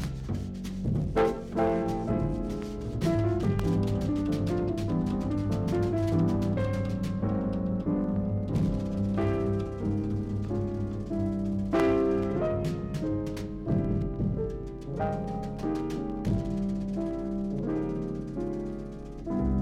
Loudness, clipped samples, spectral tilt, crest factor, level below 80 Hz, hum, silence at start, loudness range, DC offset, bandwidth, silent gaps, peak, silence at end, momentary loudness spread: -30 LUFS; under 0.1%; -8.5 dB/octave; 16 dB; -40 dBFS; none; 0 s; 3 LU; under 0.1%; 13 kHz; none; -14 dBFS; 0 s; 7 LU